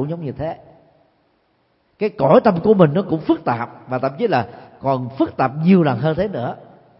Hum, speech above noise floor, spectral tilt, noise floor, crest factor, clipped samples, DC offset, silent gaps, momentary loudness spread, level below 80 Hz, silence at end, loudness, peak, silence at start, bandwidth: none; 45 dB; -12.5 dB/octave; -63 dBFS; 18 dB; under 0.1%; under 0.1%; none; 14 LU; -52 dBFS; 0.35 s; -18 LUFS; 0 dBFS; 0 s; 5.8 kHz